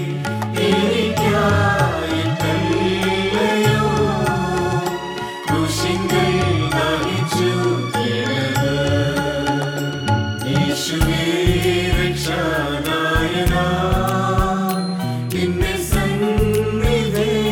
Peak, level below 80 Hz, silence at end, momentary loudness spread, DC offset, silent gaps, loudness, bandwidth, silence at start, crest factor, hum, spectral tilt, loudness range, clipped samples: -2 dBFS; -30 dBFS; 0 s; 5 LU; under 0.1%; none; -19 LUFS; 18.5 kHz; 0 s; 16 dB; none; -5.5 dB/octave; 2 LU; under 0.1%